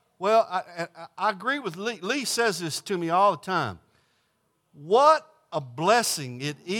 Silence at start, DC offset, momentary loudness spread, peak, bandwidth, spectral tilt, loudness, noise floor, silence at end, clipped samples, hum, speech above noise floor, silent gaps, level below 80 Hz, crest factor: 0.2 s; under 0.1%; 14 LU; -6 dBFS; 18 kHz; -3.5 dB/octave; -25 LUFS; -72 dBFS; 0 s; under 0.1%; none; 47 dB; none; -78 dBFS; 20 dB